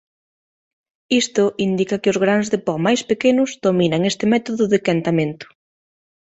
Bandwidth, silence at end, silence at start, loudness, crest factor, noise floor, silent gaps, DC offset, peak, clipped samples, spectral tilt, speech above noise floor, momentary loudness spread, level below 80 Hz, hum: 8.2 kHz; 0.75 s; 1.1 s; -18 LUFS; 16 dB; under -90 dBFS; none; under 0.1%; -4 dBFS; under 0.1%; -5 dB/octave; over 72 dB; 4 LU; -58 dBFS; none